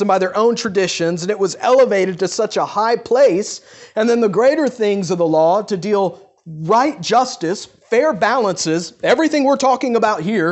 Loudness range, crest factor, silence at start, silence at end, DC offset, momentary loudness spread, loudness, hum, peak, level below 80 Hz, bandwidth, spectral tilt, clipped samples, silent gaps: 2 LU; 14 dB; 0 s; 0 s; under 0.1%; 7 LU; -16 LUFS; none; -2 dBFS; -62 dBFS; 8.4 kHz; -4.5 dB/octave; under 0.1%; none